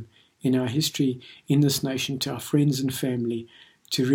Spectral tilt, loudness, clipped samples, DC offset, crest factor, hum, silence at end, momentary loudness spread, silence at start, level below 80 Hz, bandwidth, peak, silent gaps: -5 dB/octave; -25 LUFS; under 0.1%; under 0.1%; 16 dB; none; 0 s; 8 LU; 0 s; -64 dBFS; 17.5 kHz; -10 dBFS; none